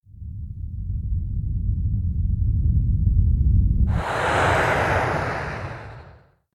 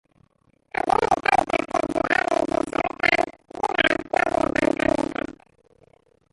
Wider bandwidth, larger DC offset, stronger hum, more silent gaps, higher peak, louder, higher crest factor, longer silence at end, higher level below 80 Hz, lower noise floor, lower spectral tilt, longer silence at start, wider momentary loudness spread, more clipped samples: about the same, 12 kHz vs 11.5 kHz; neither; neither; neither; second, -8 dBFS vs -4 dBFS; about the same, -23 LUFS vs -23 LUFS; second, 14 dB vs 20 dB; second, 0.4 s vs 1 s; first, -26 dBFS vs -50 dBFS; second, -50 dBFS vs -63 dBFS; first, -6.5 dB/octave vs -4.5 dB/octave; second, 0.15 s vs 0.85 s; first, 15 LU vs 9 LU; neither